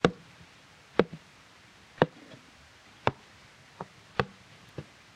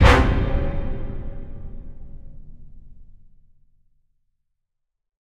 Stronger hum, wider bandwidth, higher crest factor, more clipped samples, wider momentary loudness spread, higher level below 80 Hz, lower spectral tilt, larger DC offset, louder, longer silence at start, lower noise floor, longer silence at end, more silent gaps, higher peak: neither; about the same, 12 kHz vs 11 kHz; first, 30 dB vs 22 dB; neither; second, 24 LU vs 27 LU; second, -60 dBFS vs -26 dBFS; about the same, -6 dB/octave vs -6.5 dB/octave; second, under 0.1% vs 0.4%; second, -32 LUFS vs -23 LUFS; about the same, 0.05 s vs 0 s; second, -56 dBFS vs -78 dBFS; second, 0.35 s vs 2.2 s; neither; second, -4 dBFS vs 0 dBFS